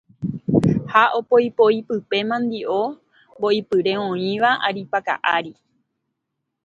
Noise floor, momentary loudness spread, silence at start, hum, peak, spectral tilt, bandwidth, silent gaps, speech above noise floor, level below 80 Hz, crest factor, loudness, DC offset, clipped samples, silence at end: -79 dBFS; 8 LU; 0.2 s; none; 0 dBFS; -7 dB/octave; 9.2 kHz; none; 59 dB; -54 dBFS; 20 dB; -20 LUFS; under 0.1%; under 0.1%; 1.15 s